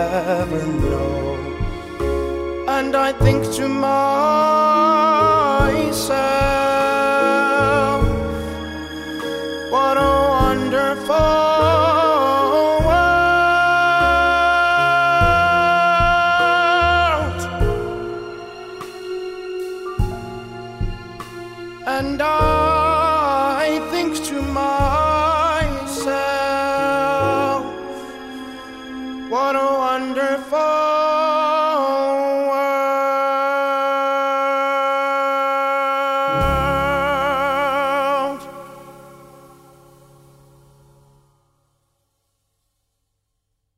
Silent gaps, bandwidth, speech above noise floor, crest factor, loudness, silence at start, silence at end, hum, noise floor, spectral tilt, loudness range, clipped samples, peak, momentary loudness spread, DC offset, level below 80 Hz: none; 16 kHz; 56 dB; 16 dB; -17 LUFS; 0 s; 4.55 s; none; -73 dBFS; -5.5 dB/octave; 8 LU; under 0.1%; -2 dBFS; 14 LU; under 0.1%; -32 dBFS